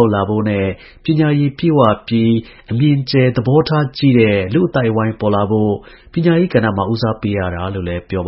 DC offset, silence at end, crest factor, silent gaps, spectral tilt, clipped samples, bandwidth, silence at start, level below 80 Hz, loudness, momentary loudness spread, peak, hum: under 0.1%; 0 s; 14 dB; none; -11 dB/octave; under 0.1%; 5.8 kHz; 0 s; -42 dBFS; -15 LUFS; 9 LU; 0 dBFS; none